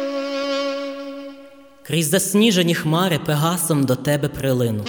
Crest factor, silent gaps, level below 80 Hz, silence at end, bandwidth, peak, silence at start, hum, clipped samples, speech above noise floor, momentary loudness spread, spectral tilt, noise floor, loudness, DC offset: 16 dB; none; -52 dBFS; 0 s; over 20 kHz; -4 dBFS; 0 s; none; under 0.1%; 25 dB; 14 LU; -4.5 dB/octave; -44 dBFS; -19 LUFS; under 0.1%